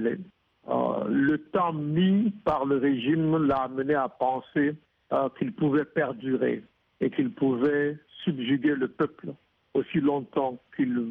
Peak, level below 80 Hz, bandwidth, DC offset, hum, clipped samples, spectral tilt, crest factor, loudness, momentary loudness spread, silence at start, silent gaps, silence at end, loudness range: -12 dBFS; -62 dBFS; 4.1 kHz; under 0.1%; none; under 0.1%; -9.5 dB/octave; 14 dB; -27 LUFS; 7 LU; 0 s; none; 0 s; 3 LU